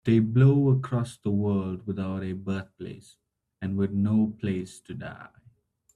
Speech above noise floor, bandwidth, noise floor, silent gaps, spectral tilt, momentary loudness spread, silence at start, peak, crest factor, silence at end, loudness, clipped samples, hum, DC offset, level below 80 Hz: 35 dB; 10.5 kHz; -61 dBFS; none; -9 dB/octave; 21 LU; 0.05 s; -8 dBFS; 18 dB; 0.7 s; -26 LUFS; under 0.1%; none; under 0.1%; -62 dBFS